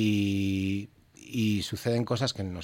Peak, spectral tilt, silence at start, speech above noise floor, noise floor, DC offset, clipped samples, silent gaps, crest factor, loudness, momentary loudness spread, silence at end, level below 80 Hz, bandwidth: -14 dBFS; -6 dB/octave; 0 s; 21 dB; -49 dBFS; under 0.1%; under 0.1%; none; 14 dB; -29 LUFS; 8 LU; 0 s; -60 dBFS; 16.5 kHz